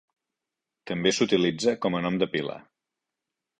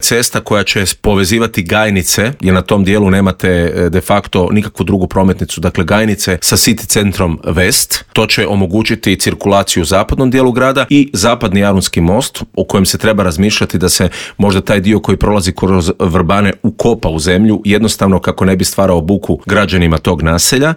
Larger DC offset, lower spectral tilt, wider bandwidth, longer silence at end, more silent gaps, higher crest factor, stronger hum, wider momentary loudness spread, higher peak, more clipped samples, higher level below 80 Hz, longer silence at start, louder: second, under 0.1% vs 0.6%; about the same, -4.5 dB/octave vs -4.5 dB/octave; second, 10.5 kHz vs 19 kHz; first, 1 s vs 0 s; neither; first, 20 dB vs 10 dB; neither; first, 12 LU vs 4 LU; second, -8 dBFS vs 0 dBFS; neither; second, -64 dBFS vs -30 dBFS; first, 0.85 s vs 0 s; second, -26 LUFS vs -11 LUFS